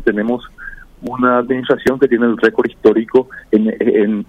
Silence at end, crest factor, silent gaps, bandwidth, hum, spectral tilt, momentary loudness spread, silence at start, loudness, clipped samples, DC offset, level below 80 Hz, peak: 0.05 s; 14 dB; none; 11 kHz; none; -7.5 dB/octave; 14 LU; 0 s; -15 LUFS; under 0.1%; under 0.1%; -44 dBFS; 0 dBFS